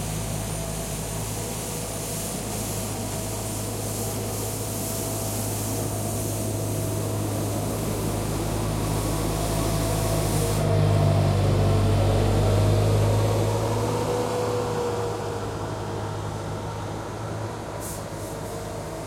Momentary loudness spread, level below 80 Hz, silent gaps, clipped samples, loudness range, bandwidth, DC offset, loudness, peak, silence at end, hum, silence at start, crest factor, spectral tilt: 10 LU; -36 dBFS; none; under 0.1%; 7 LU; 16.5 kHz; under 0.1%; -26 LUFS; -10 dBFS; 0 s; none; 0 s; 16 dB; -5.5 dB/octave